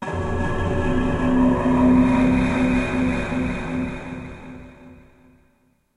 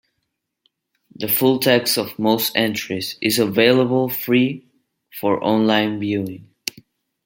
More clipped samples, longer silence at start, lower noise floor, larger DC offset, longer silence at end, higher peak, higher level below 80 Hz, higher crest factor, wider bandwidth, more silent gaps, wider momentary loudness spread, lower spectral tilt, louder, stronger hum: neither; second, 0 s vs 1.2 s; second, -62 dBFS vs -76 dBFS; neither; first, 1.05 s vs 0.85 s; second, -6 dBFS vs 0 dBFS; first, -32 dBFS vs -64 dBFS; about the same, 16 dB vs 20 dB; second, 11 kHz vs 17 kHz; neither; first, 18 LU vs 15 LU; first, -7.5 dB/octave vs -4.5 dB/octave; about the same, -20 LUFS vs -18 LUFS; neither